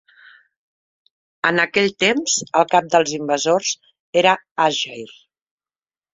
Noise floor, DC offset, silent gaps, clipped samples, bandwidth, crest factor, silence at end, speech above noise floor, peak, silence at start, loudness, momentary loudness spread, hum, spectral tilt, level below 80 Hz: under -90 dBFS; under 0.1%; 4.00-4.13 s, 4.51-4.56 s; under 0.1%; 7.8 kHz; 20 dB; 1.05 s; over 72 dB; -2 dBFS; 1.45 s; -18 LUFS; 9 LU; none; -2.5 dB/octave; -66 dBFS